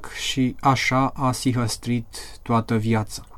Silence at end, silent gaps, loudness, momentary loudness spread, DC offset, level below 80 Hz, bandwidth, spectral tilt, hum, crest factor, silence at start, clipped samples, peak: 0 s; none; -23 LUFS; 7 LU; under 0.1%; -44 dBFS; 16 kHz; -5 dB/octave; none; 16 dB; 0 s; under 0.1%; -6 dBFS